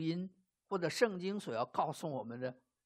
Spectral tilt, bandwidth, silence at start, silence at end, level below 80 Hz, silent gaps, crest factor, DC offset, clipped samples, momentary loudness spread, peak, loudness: -5.5 dB/octave; 15 kHz; 0 s; 0.3 s; -84 dBFS; none; 22 dB; under 0.1%; under 0.1%; 10 LU; -16 dBFS; -38 LUFS